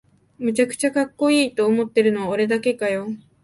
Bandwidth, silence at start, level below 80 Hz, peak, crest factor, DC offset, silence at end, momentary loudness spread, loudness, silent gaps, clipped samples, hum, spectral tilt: 11.5 kHz; 0.4 s; -66 dBFS; -6 dBFS; 14 dB; under 0.1%; 0.25 s; 6 LU; -20 LUFS; none; under 0.1%; none; -4.5 dB/octave